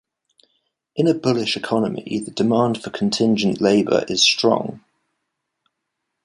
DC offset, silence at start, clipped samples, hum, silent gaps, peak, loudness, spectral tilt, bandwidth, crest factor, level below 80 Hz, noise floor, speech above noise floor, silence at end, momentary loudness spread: under 0.1%; 0.95 s; under 0.1%; none; none; -2 dBFS; -19 LUFS; -4.5 dB/octave; 11.5 kHz; 18 dB; -60 dBFS; -78 dBFS; 59 dB; 1.45 s; 9 LU